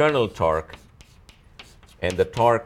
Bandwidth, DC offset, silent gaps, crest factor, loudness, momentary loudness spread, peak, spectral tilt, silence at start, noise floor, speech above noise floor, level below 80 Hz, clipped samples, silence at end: 14.5 kHz; under 0.1%; none; 18 dB; -23 LUFS; 19 LU; -6 dBFS; -6 dB/octave; 0 s; -51 dBFS; 30 dB; -46 dBFS; under 0.1%; 0 s